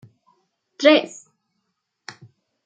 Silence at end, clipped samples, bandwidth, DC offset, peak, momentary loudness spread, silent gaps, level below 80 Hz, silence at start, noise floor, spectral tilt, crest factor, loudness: 1.6 s; under 0.1%; 9 kHz; under 0.1%; -2 dBFS; 26 LU; none; -78 dBFS; 0.8 s; -76 dBFS; -3 dB/octave; 22 dB; -17 LUFS